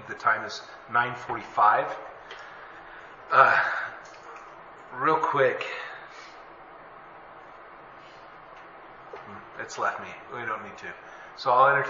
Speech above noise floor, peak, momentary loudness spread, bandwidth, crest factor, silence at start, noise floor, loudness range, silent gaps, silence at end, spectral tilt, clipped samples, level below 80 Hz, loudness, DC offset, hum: 22 dB; -4 dBFS; 25 LU; 7.6 kHz; 26 dB; 0 s; -47 dBFS; 19 LU; none; 0 s; -4 dB/octave; under 0.1%; -68 dBFS; -25 LUFS; under 0.1%; none